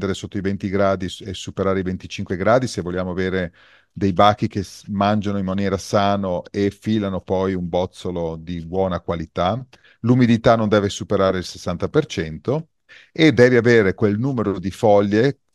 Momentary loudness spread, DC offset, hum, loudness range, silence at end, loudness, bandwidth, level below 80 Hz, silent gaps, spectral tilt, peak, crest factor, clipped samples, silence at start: 11 LU; under 0.1%; none; 5 LU; 0.2 s; -20 LUFS; 12.5 kHz; -52 dBFS; none; -6.5 dB/octave; 0 dBFS; 20 dB; under 0.1%; 0 s